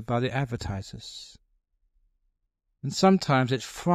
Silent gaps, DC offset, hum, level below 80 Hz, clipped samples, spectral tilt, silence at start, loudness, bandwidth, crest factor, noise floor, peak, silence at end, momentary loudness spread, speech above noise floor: none; under 0.1%; none; -54 dBFS; under 0.1%; -6 dB/octave; 0 s; -26 LUFS; 14 kHz; 22 dB; -78 dBFS; -6 dBFS; 0 s; 18 LU; 52 dB